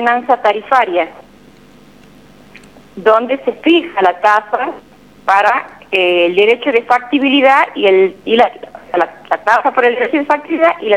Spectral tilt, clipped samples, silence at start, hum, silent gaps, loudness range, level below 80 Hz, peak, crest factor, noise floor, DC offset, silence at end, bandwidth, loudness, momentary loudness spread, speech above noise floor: -4.5 dB/octave; under 0.1%; 0 s; none; none; 5 LU; -58 dBFS; 0 dBFS; 14 dB; -42 dBFS; 0.2%; 0 s; 12 kHz; -13 LUFS; 8 LU; 30 dB